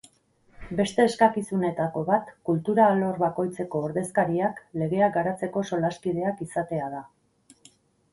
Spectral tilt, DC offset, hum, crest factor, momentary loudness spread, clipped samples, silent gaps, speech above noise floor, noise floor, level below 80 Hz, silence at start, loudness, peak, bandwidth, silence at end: -6.5 dB/octave; under 0.1%; none; 20 dB; 10 LU; under 0.1%; none; 37 dB; -62 dBFS; -60 dBFS; 0.6 s; -26 LUFS; -6 dBFS; 11.5 kHz; 1.1 s